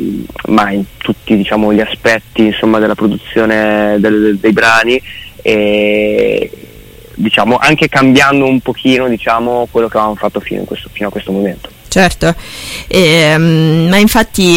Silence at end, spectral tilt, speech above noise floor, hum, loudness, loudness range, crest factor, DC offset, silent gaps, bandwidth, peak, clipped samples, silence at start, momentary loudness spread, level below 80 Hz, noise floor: 0 s; -5 dB/octave; 24 dB; none; -10 LUFS; 4 LU; 10 dB; under 0.1%; none; 17 kHz; 0 dBFS; under 0.1%; 0 s; 12 LU; -34 dBFS; -34 dBFS